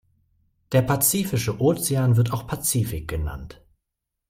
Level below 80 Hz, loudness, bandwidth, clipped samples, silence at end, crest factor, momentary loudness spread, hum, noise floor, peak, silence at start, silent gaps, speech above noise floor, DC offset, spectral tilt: -42 dBFS; -22 LUFS; 16.5 kHz; under 0.1%; 0.75 s; 18 dB; 11 LU; none; -82 dBFS; -6 dBFS; 0.7 s; none; 60 dB; under 0.1%; -5 dB/octave